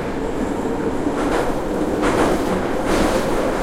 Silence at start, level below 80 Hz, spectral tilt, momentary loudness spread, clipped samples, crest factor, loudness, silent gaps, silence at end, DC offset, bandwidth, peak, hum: 0 s; -32 dBFS; -5.5 dB/octave; 5 LU; under 0.1%; 14 dB; -20 LUFS; none; 0 s; under 0.1%; 16.5 kHz; -4 dBFS; none